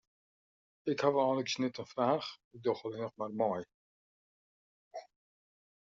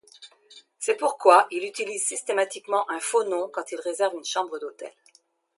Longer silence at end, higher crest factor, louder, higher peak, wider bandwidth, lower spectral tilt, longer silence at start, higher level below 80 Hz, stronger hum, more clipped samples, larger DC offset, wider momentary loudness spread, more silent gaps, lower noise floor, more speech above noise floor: first, 0.8 s vs 0.65 s; about the same, 22 dB vs 24 dB; second, -35 LUFS vs -25 LUFS; second, -16 dBFS vs -2 dBFS; second, 7.4 kHz vs 11.5 kHz; first, -4 dB/octave vs -0.5 dB/octave; first, 0.85 s vs 0.2 s; first, -80 dBFS vs -88 dBFS; neither; neither; neither; first, 20 LU vs 15 LU; first, 2.44-2.51 s, 3.74-4.91 s vs none; first, under -90 dBFS vs -63 dBFS; first, over 56 dB vs 38 dB